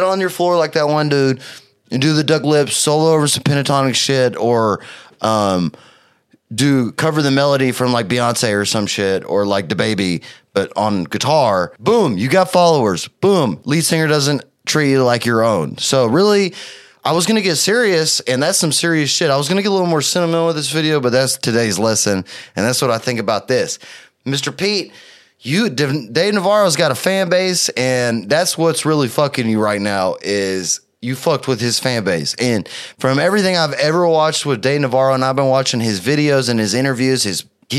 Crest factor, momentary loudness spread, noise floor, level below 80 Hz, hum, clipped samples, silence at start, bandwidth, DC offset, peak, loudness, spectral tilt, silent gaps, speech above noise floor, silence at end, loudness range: 16 dB; 7 LU; -55 dBFS; -60 dBFS; none; under 0.1%; 0 s; 15 kHz; under 0.1%; 0 dBFS; -16 LUFS; -4 dB/octave; none; 39 dB; 0 s; 3 LU